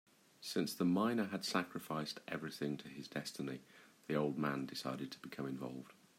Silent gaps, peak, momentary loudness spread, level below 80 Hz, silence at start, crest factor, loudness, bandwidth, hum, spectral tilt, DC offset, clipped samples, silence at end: none; -20 dBFS; 11 LU; -82 dBFS; 0.4 s; 20 dB; -41 LUFS; 16 kHz; none; -5 dB/octave; under 0.1%; under 0.1%; 0.25 s